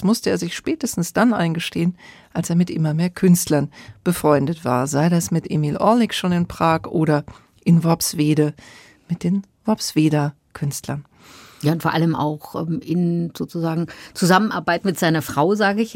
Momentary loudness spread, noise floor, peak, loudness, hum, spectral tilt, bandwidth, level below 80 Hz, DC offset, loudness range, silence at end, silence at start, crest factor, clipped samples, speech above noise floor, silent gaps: 10 LU; -45 dBFS; -2 dBFS; -20 LUFS; none; -5.5 dB/octave; 16.5 kHz; -54 dBFS; under 0.1%; 4 LU; 0 s; 0 s; 18 dB; under 0.1%; 26 dB; none